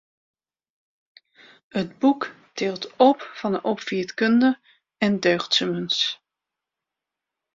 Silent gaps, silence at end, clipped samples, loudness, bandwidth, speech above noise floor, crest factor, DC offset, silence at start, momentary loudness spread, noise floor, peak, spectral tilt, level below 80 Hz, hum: none; 1.4 s; under 0.1%; -23 LUFS; 7.6 kHz; 64 dB; 20 dB; under 0.1%; 1.75 s; 11 LU; -86 dBFS; -4 dBFS; -4.5 dB/octave; -68 dBFS; none